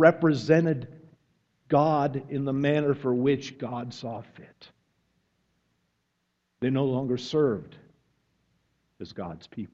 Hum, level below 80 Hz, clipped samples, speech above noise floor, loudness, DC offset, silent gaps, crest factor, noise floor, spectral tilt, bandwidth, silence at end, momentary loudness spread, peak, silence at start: none; -66 dBFS; under 0.1%; 51 dB; -26 LUFS; under 0.1%; none; 24 dB; -77 dBFS; -7.5 dB/octave; 7.8 kHz; 0.05 s; 16 LU; -4 dBFS; 0 s